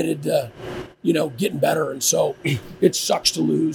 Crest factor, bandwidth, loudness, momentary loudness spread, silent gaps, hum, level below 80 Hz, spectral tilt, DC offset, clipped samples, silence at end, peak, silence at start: 20 dB; 19 kHz; -21 LUFS; 7 LU; none; none; -54 dBFS; -4 dB/octave; under 0.1%; under 0.1%; 0 s; -2 dBFS; 0 s